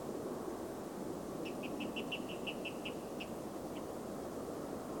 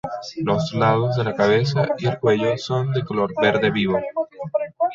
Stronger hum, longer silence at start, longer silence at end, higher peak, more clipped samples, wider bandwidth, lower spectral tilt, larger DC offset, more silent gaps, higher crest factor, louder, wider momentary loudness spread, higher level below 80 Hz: neither; about the same, 0 s vs 0.05 s; about the same, 0 s vs 0 s; second, -28 dBFS vs -4 dBFS; neither; first, 19 kHz vs 7.6 kHz; second, -4.5 dB/octave vs -7 dB/octave; neither; neither; about the same, 16 dB vs 16 dB; second, -43 LUFS vs -21 LUFS; second, 3 LU vs 8 LU; second, -66 dBFS vs -54 dBFS